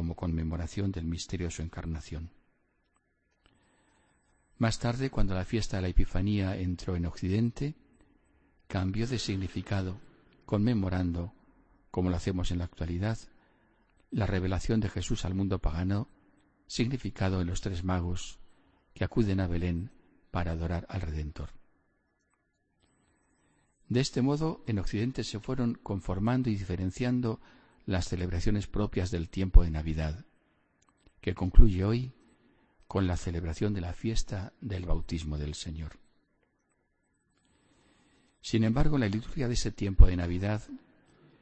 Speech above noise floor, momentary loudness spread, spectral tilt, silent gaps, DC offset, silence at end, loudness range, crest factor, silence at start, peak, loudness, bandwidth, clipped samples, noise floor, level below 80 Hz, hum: 47 dB; 11 LU; -6.5 dB/octave; none; under 0.1%; 0.65 s; 8 LU; 26 dB; 0 s; -2 dBFS; -32 LUFS; 8.6 kHz; under 0.1%; -75 dBFS; -34 dBFS; none